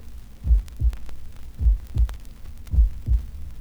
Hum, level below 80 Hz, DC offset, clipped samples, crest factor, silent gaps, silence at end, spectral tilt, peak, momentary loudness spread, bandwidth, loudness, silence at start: none; -24 dBFS; under 0.1%; under 0.1%; 16 dB; none; 0 s; -7.5 dB/octave; -8 dBFS; 20 LU; 4.2 kHz; -26 LUFS; 0 s